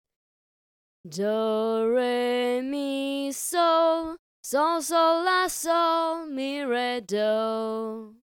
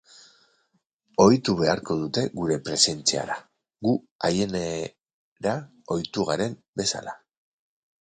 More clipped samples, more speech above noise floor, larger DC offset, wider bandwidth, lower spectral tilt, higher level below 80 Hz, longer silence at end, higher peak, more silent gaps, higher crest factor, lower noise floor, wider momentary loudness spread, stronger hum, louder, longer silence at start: neither; first, over 65 dB vs 47 dB; neither; first, 17.5 kHz vs 9.6 kHz; about the same, -3 dB/octave vs -4 dB/octave; second, -68 dBFS vs -56 dBFS; second, 0.2 s vs 0.85 s; second, -10 dBFS vs -2 dBFS; second, 4.19-4.43 s vs 4.11-4.19 s, 5.13-5.36 s, 6.68-6.73 s; second, 16 dB vs 24 dB; first, under -90 dBFS vs -72 dBFS; second, 9 LU vs 13 LU; neither; about the same, -25 LUFS vs -25 LUFS; second, 1.05 s vs 1.2 s